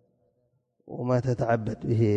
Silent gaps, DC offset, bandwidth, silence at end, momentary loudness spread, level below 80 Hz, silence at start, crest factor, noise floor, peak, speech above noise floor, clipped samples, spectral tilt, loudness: none; under 0.1%; 8 kHz; 0 s; 9 LU; -54 dBFS; 0.85 s; 16 dB; -72 dBFS; -12 dBFS; 47 dB; under 0.1%; -9 dB/octave; -27 LUFS